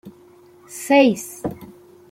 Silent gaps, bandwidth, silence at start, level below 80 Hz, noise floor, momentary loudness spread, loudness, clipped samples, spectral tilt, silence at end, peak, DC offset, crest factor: none; 16.5 kHz; 0.05 s; -58 dBFS; -49 dBFS; 22 LU; -18 LUFS; under 0.1%; -4.5 dB/octave; 0.45 s; -4 dBFS; under 0.1%; 18 dB